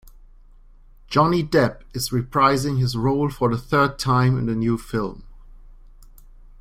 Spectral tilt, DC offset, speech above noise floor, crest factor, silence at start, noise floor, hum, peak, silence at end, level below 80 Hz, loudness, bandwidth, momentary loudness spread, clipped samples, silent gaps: -6 dB/octave; under 0.1%; 27 dB; 20 dB; 0.05 s; -47 dBFS; none; -4 dBFS; 0.55 s; -42 dBFS; -21 LUFS; 16 kHz; 7 LU; under 0.1%; none